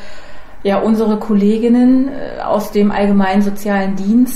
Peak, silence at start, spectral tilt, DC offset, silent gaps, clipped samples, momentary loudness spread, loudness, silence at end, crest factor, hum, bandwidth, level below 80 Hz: -2 dBFS; 0 s; -7 dB/octave; under 0.1%; none; under 0.1%; 7 LU; -14 LUFS; 0 s; 10 dB; none; 15 kHz; -36 dBFS